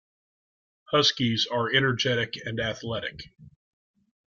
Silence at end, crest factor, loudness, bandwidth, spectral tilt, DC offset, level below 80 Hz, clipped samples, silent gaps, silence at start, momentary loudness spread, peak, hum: 0.8 s; 22 dB; -25 LUFS; 7.4 kHz; -4 dB/octave; under 0.1%; -60 dBFS; under 0.1%; none; 0.9 s; 10 LU; -8 dBFS; none